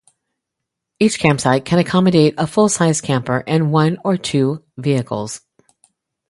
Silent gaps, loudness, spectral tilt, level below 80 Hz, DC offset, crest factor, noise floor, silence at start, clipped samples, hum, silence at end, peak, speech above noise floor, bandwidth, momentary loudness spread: none; -16 LUFS; -5.5 dB/octave; -52 dBFS; under 0.1%; 18 dB; -80 dBFS; 1 s; under 0.1%; none; 0.95 s; 0 dBFS; 64 dB; 11.5 kHz; 8 LU